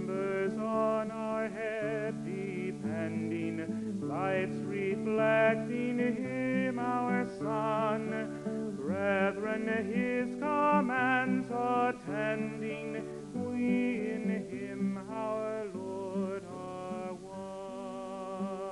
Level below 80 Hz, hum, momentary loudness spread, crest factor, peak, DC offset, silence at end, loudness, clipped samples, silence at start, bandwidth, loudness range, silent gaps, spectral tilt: -68 dBFS; none; 11 LU; 18 dB; -14 dBFS; under 0.1%; 0 s; -33 LUFS; under 0.1%; 0 s; 11.5 kHz; 6 LU; none; -7 dB/octave